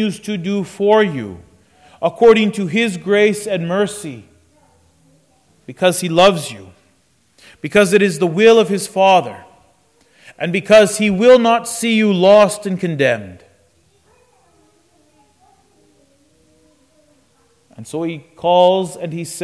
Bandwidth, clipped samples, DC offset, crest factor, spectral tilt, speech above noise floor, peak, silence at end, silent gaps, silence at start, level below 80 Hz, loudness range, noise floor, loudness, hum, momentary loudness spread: 11 kHz; under 0.1%; under 0.1%; 14 dB; -5 dB/octave; 44 dB; -2 dBFS; 0 s; none; 0 s; -56 dBFS; 8 LU; -58 dBFS; -14 LUFS; none; 15 LU